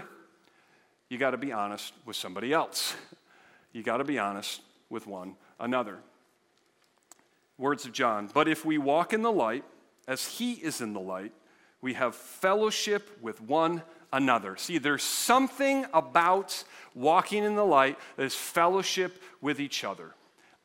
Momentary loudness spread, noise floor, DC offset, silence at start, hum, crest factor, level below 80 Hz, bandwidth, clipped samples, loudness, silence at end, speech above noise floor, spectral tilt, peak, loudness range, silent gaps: 15 LU; -69 dBFS; under 0.1%; 0 s; none; 24 dB; -80 dBFS; 16.5 kHz; under 0.1%; -29 LUFS; 0.5 s; 40 dB; -3 dB/octave; -6 dBFS; 8 LU; none